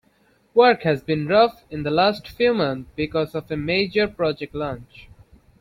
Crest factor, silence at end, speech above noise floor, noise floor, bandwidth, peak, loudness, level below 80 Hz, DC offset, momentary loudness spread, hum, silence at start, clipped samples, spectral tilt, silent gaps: 18 dB; 0.6 s; 40 dB; -61 dBFS; 12.5 kHz; -4 dBFS; -21 LUFS; -50 dBFS; under 0.1%; 11 LU; none; 0.55 s; under 0.1%; -7 dB/octave; none